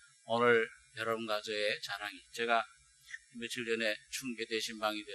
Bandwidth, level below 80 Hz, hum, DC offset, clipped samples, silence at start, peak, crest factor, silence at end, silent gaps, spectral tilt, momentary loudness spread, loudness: 13 kHz; -78 dBFS; none; under 0.1%; under 0.1%; 0.25 s; -14 dBFS; 22 dB; 0 s; none; -3 dB/octave; 14 LU; -35 LUFS